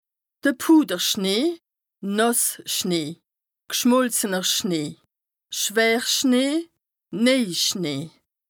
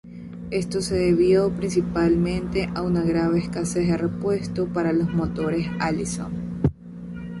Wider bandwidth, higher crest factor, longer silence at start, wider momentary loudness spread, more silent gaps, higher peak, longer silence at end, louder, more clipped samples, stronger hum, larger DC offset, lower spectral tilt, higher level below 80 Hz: first, over 20 kHz vs 11.5 kHz; about the same, 18 dB vs 14 dB; first, 0.45 s vs 0.05 s; first, 14 LU vs 10 LU; neither; about the same, -6 dBFS vs -8 dBFS; first, 0.4 s vs 0 s; about the same, -21 LUFS vs -23 LUFS; neither; neither; neither; second, -3 dB/octave vs -6.5 dB/octave; second, -74 dBFS vs -42 dBFS